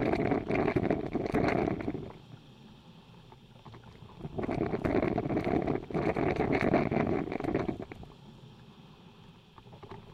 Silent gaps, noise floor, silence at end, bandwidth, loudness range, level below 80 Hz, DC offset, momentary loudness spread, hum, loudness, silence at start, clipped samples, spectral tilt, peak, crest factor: none; -55 dBFS; 0 s; 12 kHz; 7 LU; -50 dBFS; under 0.1%; 23 LU; none; -31 LUFS; 0 s; under 0.1%; -8.5 dB/octave; -12 dBFS; 20 dB